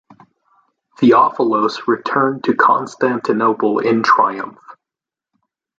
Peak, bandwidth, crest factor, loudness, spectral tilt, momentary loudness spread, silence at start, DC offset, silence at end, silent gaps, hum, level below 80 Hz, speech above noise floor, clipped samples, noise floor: -2 dBFS; 7.8 kHz; 16 dB; -15 LUFS; -6 dB/octave; 6 LU; 1 s; under 0.1%; 1.05 s; none; none; -66 dBFS; 73 dB; under 0.1%; -87 dBFS